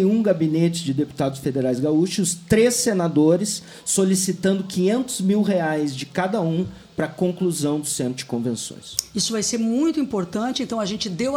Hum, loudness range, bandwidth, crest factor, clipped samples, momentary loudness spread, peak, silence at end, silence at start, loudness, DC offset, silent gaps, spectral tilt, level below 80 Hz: none; 4 LU; 19 kHz; 18 dB; under 0.1%; 8 LU; -4 dBFS; 0 s; 0 s; -22 LUFS; under 0.1%; none; -5 dB/octave; -56 dBFS